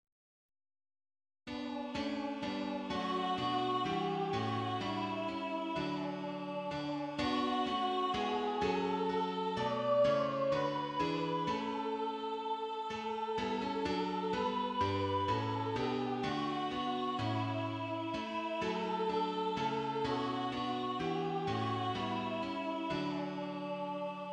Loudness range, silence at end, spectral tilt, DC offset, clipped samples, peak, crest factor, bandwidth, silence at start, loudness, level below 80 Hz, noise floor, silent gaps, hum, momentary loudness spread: 3 LU; 0 s; -6 dB/octave; under 0.1%; under 0.1%; -20 dBFS; 16 dB; 10 kHz; 1.45 s; -36 LUFS; -66 dBFS; under -90 dBFS; none; none; 5 LU